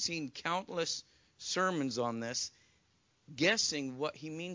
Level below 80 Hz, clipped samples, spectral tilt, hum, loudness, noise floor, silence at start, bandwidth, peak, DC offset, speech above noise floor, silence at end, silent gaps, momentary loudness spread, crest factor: -74 dBFS; under 0.1%; -2.5 dB/octave; none; -35 LUFS; -73 dBFS; 0 s; 7.8 kHz; -16 dBFS; under 0.1%; 37 dB; 0 s; none; 11 LU; 22 dB